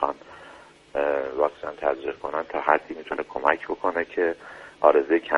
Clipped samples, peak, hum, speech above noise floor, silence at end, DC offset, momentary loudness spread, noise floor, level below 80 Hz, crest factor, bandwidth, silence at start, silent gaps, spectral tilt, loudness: under 0.1%; -2 dBFS; none; 24 dB; 0 s; under 0.1%; 13 LU; -48 dBFS; -60 dBFS; 24 dB; 9.6 kHz; 0 s; none; -5.5 dB/octave; -25 LUFS